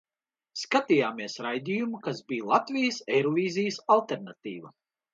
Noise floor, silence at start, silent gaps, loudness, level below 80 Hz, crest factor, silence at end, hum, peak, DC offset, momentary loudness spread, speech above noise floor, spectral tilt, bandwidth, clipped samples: under -90 dBFS; 0.55 s; none; -28 LUFS; -78 dBFS; 22 dB; 0.45 s; none; -8 dBFS; under 0.1%; 15 LU; over 62 dB; -5 dB/octave; 7.8 kHz; under 0.1%